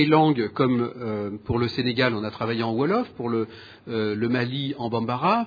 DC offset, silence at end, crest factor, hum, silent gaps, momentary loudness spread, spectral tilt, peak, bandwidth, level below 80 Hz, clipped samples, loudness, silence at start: under 0.1%; 0 s; 20 dB; none; none; 7 LU; -8.5 dB/octave; -4 dBFS; 5 kHz; -54 dBFS; under 0.1%; -25 LUFS; 0 s